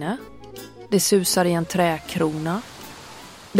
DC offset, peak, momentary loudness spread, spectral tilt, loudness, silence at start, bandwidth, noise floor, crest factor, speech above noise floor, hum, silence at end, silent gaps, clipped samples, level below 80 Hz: under 0.1%; -2 dBFS; 22 LU; -4 dB/octave; -22 LUFS; 0 s; 16.5 kHz; -42 dBFS; 20 dB; 20 dB; none; 0 s; none; under 0.1%; -54 dBFS